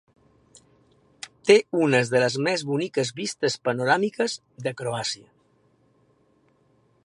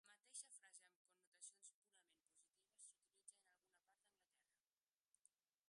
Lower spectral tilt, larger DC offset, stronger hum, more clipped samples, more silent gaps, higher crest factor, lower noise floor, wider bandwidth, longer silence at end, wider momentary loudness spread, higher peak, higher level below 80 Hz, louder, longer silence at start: first, -4.5 dB/octave vs 3 dB/octave; neither; neither; neither; second, none vs 0.96-1.05 s, 1.27-1.32 s, 1.74-1.82 s, 4.61-4.65 s, 5.01-5.12 s; about the same, 24 dB vs 26 dB; second, -63 dBFS vs under -90 dBFS; about the same, 11.5 kHz vs 11 kHz; first, 1.9 s vs 0.4 s; about the same, 12 LU vs 10 LU; first, -2 dBFS vs -44 dBFS; first, -70 dBFS vs under -90 dBFS; first, -24 LUFS vs -63 LUFS; first, 1.25 s vs 0.05 s